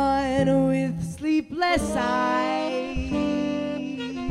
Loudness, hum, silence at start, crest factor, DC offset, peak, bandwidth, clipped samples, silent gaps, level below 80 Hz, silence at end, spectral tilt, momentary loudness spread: -25 LUFS; none; 0 s; 16 dB; under 0.1%; -8 dBFS; 12.5 kHz; under 0.1%; none; -42 dBFS; 0 s; -6 dB/octave; 8 LU